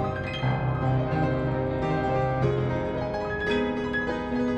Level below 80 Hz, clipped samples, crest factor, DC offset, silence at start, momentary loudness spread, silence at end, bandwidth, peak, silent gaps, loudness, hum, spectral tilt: -42 dBFS; under 0.1%; 14 dB; under 0.1%; 0 s; 3 LU; 0 s; 7.8 kHz; -12 dBFS; none; -27 LUFS; none; -8 dB/octave